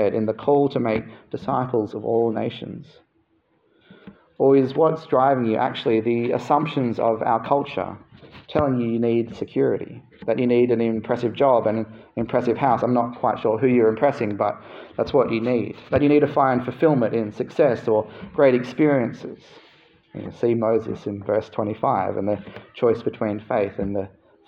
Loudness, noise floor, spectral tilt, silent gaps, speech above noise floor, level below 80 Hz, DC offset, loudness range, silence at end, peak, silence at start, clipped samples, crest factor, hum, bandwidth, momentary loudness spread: -22 LUFS; -65 dBFS; -8.5 dB/octave; none; 44 dB; -58 dBFS; under 0.1%; 4 LU; 0.4 s; -4 dBFS; 0 s; under 0.1%; 18 dB; none; 7.2 kHz; 12 LU